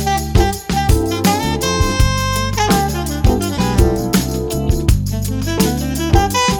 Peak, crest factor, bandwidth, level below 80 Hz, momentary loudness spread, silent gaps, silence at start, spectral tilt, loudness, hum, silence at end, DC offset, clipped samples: 0 dBFS; 14 dB; over 20 kHz; -20 dBFS; 4 LU; none; 0 s; -5 dB/octave; -16 LUFS; none; 0 s; under 0.1%; under 0.1%